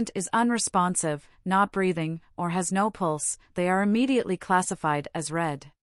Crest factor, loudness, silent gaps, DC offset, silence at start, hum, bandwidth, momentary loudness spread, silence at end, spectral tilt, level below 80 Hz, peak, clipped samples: 16 dB; -26 LUFS; none; under 0.1%; 0 s; none; 12 kHz; 8 LU; 0.15 s; -4.5 dB/octave; -60 dBFS; -10 dBFS; under 0.1%